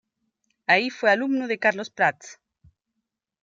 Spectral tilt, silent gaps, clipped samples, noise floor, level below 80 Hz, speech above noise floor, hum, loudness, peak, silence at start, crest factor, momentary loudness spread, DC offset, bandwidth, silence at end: -4 dB/octave; none; under 0.1%; -82 dBFS; -74 dBFS; 59 dB; none; -22 LUFS; -4 dBFS; 0.7 s; 22 dB; 6 LU; under 0.1%; 7.8 kHz; 1.1 s